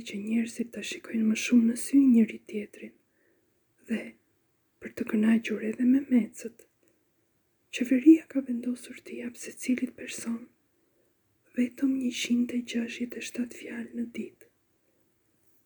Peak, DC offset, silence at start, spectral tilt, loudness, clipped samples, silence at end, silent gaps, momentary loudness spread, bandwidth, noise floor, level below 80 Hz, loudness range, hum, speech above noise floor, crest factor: -8 dBFS; under 0.1%; 0 s; -4.5 dB/octave; -28 LUFS; under 0.1%; 1.35 s; none; 17 LU; over 20 kHz; -72 dBFS; -76 dBFS; 7 LU; none; 45 dB; 22 dB